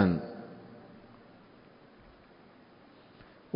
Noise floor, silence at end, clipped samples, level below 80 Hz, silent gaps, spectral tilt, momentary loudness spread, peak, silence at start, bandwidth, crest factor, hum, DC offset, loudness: -57 dBFS; 2.55 s; under 0.1%; -58 dBFS; none; -7.5 dB/octave; 17 LU; -10 dBFS; 0 s; 5.2 kHz; 26 dB; none; under 0.1%; -36 LUFS